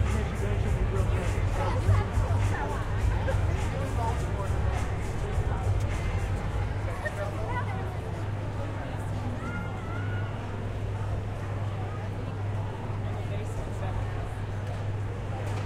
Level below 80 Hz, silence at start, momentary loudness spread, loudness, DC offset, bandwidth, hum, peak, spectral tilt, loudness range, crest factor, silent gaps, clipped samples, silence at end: -34 dBFS; 0 s; 6 LU; -31 LUFS; under 0.1%; 12 kHz; none; -12 dBFS; -7 dB/octave; 5 LU; 16 dB; none; under 0.1%; 0 s